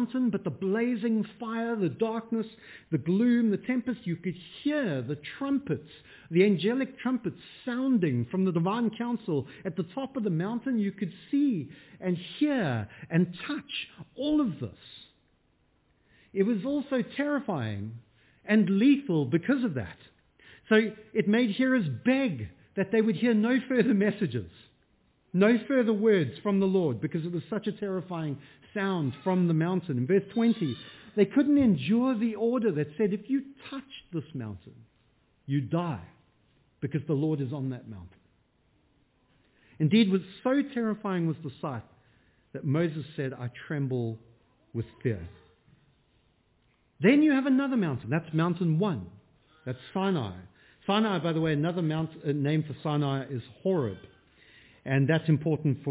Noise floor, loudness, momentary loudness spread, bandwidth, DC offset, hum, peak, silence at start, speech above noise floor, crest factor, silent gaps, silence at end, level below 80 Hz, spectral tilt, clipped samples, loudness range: -69 dBFS; -28 LUFS; 14 LU; 4 kHz; under 0.1%; none; -10 dBFS; 0 s; 41 dB; 20 dB; none; 0 s; -62 dBFS; -6.5 dB/octave; under 0.1%; 7 LU